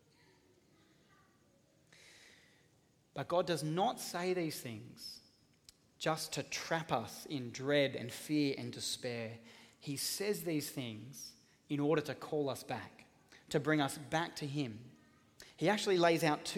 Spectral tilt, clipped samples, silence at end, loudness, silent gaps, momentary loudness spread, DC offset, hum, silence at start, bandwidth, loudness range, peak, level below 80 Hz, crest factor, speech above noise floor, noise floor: -4.5 dB/octave; under 0.1%; 0 s; -37 LUFS; none; 17 LU; under 0.1%; none; 2.05 s; 17.5 kHz; 4 LU; -16 dBFS; -76 dBFS; 22 dB; 34 dB; -71 dBFS